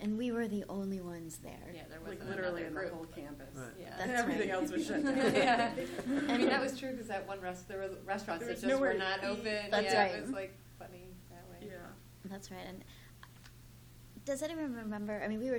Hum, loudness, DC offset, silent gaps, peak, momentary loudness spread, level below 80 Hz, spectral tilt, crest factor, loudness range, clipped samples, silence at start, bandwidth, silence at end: none; -35 LUFS; under 0.1%; none; -16 dBFS; 21 LU; -62 dBFS; -4.5 dB/octave; 22 dB; 14 LU; under 0.1%; 0 s; over 20 kHz; 0 s